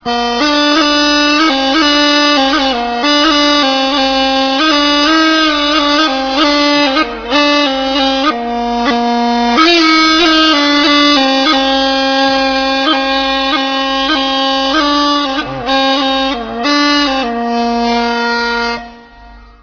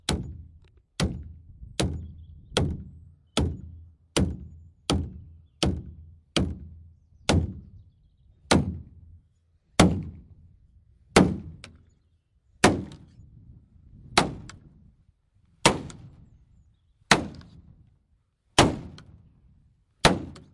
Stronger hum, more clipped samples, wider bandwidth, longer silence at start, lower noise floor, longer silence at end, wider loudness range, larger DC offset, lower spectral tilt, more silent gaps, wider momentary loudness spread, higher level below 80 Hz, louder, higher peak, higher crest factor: neither; neither; second, 5.4 kHz vs 11.5 kHz; about the same, 0.05 s vs 0.1 s; second, -36 dBFS vs -69 dBFS; about the same, 0.2 s vs 0.15 s; about the same, 4 LU vs 4 LU; neither; second, -2 dB/octave vs -4.5 dB/octave; neither; second, 7 LU vs 25 LU; about the same, -40 dBFS vs -44 dBFS; first, -10 LUFS vs -26 LUFS; about the same, 0 dBFS vs -2 dBFS; second, 12 dB vs 28 dB